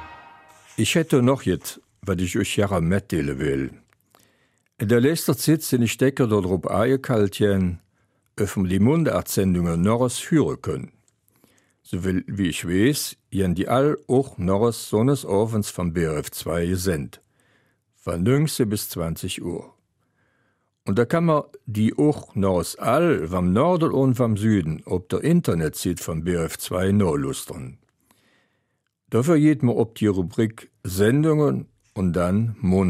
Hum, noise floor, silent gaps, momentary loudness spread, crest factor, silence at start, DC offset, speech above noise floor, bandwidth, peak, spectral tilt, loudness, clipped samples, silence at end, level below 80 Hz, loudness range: none; -74 dBFS; none; 10 LU; 16 dB; 0 s; under 0.1%; 52 dB; 16 kHz; -6 dBFS; -6 dB/octave; -22 LUFS; under 0.1%; 0 s; -48 dBFS; 5 LU